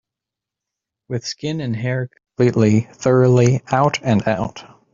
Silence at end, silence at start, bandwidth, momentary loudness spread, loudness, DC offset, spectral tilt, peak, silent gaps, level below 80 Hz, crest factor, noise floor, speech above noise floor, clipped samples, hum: 0.3 s; 1.1 s; 7.6 kHz; 13 LU; -18 LUFS; under 0.1%; -6.5 dB/octave; -2 dBFS; none; -50 dBFS; 16 dB; -85 dBFS; 68 dB; under 0.1%; none